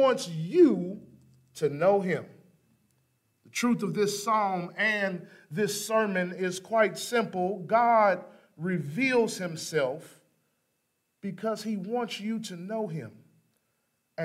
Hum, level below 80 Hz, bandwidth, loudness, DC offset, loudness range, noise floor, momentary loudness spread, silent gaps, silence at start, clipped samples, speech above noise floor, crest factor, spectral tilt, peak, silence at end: none; -78 dBFS; 16 kHz; -28 LUFS; under 0.1%; 8 LU; -77 dBFS; 14 LU; none; 0 s; under 0.1%; 50 dB; 18 dB; -5 dB/octave; -10 dBFS; 0 s